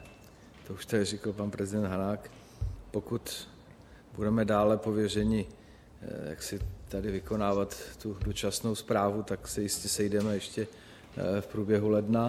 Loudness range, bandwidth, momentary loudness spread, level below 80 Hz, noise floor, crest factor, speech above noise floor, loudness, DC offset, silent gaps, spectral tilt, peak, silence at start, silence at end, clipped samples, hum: 4 LU; 15.5 kHz; 16 LU; -48 dBFS; -53 dBFS; 18 dB; 22 dB; -32 LUFS; under 0.1%; none; -5.5 dB/octave; -14 dBFS; 0 s; 0 s; under 0.1%; none